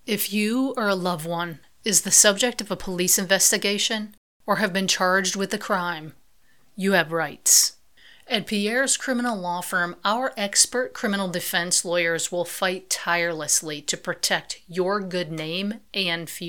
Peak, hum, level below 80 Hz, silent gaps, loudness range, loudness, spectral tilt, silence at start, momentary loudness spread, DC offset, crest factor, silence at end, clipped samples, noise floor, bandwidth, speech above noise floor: 0 dBFS; none; -58 dBFS; 4.17-4.40 s; 5 LU; -22 LUFS; -2 dB/octave; 0.05 s; 12 LU; 0.2%; 24 dB; 0 s; under 0.1%; -63 dBFS; 19 kHz; 39 dB